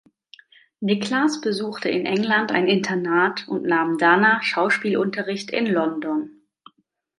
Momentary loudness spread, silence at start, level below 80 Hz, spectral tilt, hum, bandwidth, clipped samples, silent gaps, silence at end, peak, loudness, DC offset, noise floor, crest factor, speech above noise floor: 9 LU; 0.8 s; -72 dBFS; -5 dB/octave; none; 11.5 kHz; under 0.1%; none; 0.9 s; -2 dBFS; -21 LUFS; under 0.1%; -64 dBFS; 20 dB; 43 dB